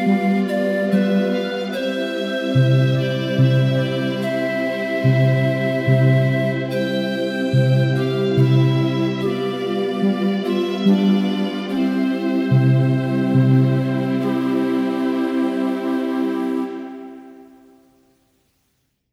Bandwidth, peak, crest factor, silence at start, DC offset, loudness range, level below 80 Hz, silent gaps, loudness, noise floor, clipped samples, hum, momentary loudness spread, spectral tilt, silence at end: 11 kHz; -4 dBFS; 14 dB; 0 s; under 0.1%; 4 LU; -64 dBFS; none; -19 LUFS; -68 dBFS; under 0.1%; none; 7 LU; -8 dB/octave; 1.7 s